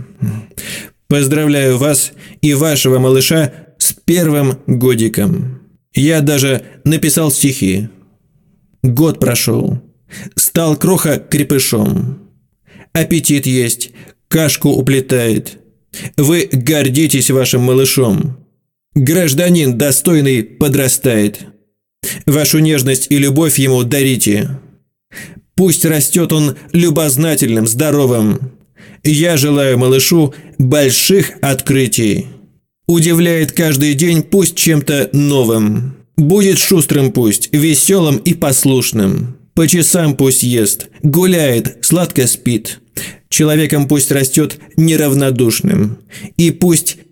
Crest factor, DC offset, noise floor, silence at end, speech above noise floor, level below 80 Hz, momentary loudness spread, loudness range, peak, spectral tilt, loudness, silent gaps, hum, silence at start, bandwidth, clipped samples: 12 dB; under 0.1%; -59 dBFS; 0.15 s; 47 dB; -46 dBFS; 10 LU; 3 LU; 0 dBFS; -4.5 dB/octave; -12 LUFS; none; none; 0 s; 18 kHz; under 0.1%